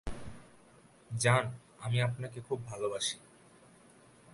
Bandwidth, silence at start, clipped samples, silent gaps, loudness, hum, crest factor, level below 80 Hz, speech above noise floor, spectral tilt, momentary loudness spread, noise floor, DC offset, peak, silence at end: 11.5 kHz; 0.05 s; under 0.1%; none; -34 LUFS; none; 24 dB; -56 dBFS; 28 dB; -4 dB/octave; 19 LU; -61 dBFS; under 0.1%; -12 dBFS; 0 s